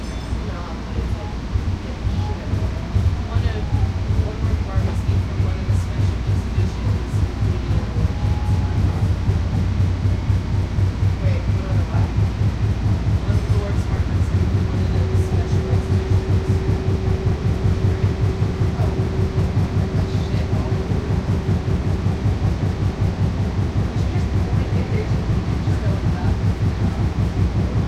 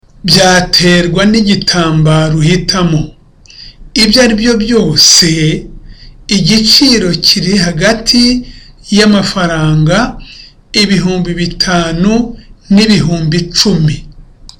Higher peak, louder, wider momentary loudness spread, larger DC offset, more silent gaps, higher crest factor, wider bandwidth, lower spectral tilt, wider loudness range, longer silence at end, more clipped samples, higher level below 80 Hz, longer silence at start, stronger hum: second, -6 dBFS vs 0 dBFS; second, -21 LUFS vs -8 LUFS; second, 3 LU vs 9 LU; neither; neither; about the same, 14 dB vs 10 dB; second, 9 kHz vs 19 kHz; first, -8 dB/octave vs -4 dB/octave; about the same, 2 LU vs 4 LU; about the same, 0 s vs 0.1 s; neither; about the same, -26 dBFS vs -28 dBFS; second, 0 s vs 0.25 s; neither